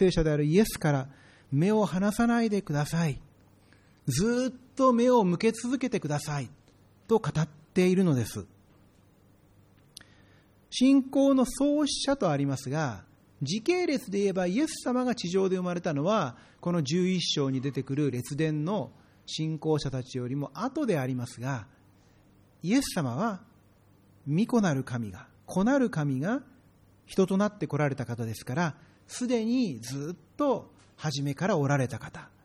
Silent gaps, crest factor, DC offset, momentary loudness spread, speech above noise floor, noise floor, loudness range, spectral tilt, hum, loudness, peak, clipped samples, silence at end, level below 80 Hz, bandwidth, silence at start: none; 18 dB; under 0.1%; 12 LU; 33 dB; -60 dBFS; 5 LU; -6 dB/octave; none; -28 LUFS; -10 dBFS; under 0.1%; 0.15 s; -54 dBFS; 15.5 kHz; 0 s